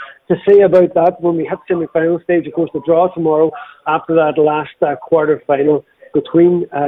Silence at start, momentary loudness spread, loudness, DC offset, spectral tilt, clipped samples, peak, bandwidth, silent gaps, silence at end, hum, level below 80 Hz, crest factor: 0 s; 9 LU; -14 LUFS; under 0.1%; -10 dB/octave; under 0.1%; -2 dBFS; 4 kHz; none; 0 s; none; -56 dBFS; 12 dB